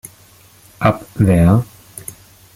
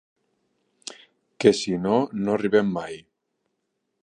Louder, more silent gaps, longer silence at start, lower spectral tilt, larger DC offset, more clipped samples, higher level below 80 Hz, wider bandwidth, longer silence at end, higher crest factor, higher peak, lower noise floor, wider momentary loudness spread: first, -15 LUFS vs -23 LUFS; neither; about the same, 0.8 s vs 0.9 s; first, -7.5 dB/octave vs -5.5 dB/octave; neither; neither; first, -38 dBFS vs -64 dBFS; first, 16 kHz vs 10 kHz; second, 0.45 s vs 1.05 s; second, 16 dB vs 24 dB; about the same, -2 dBFS vs -2 dBFS; second, -47 dBFS vs -77 dBFS; about the same, 21 LU vs 20 LU